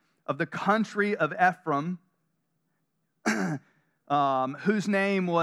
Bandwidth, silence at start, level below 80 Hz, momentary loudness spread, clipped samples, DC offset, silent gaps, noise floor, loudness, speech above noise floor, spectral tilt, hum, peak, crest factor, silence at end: 13 kHz; 0.3 s; -86 dBFS; 9 LU; under 0.1%; under 0.1%; none; -77 dBFS; -27 LUFS; 51 dB; -6 dB/octave; none; -8 dBFS; 20 dB; 0 s